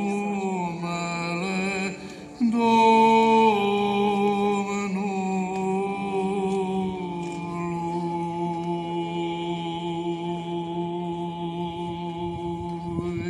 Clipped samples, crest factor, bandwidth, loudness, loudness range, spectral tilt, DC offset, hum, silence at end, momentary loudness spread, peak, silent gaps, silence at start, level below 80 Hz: under 0.1%; 16 dB; 12 kHz; -25 LUFS; 9 LU; -6 dB/octave; under 0.1%; none; 0 s; 12 LU; -8 dBFS; none; 0 s; -56 dBFS